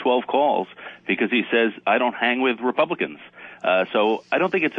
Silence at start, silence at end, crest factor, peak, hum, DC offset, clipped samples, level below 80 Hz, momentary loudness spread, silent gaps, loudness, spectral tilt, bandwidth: 0 s; 0 s; 16 dB; -6 dBFS; none; under 0.1%; under 0.1%; -78 dBFS; 9 LU; none; -21 LUFS; -7 dB/octave; 6.6 kHz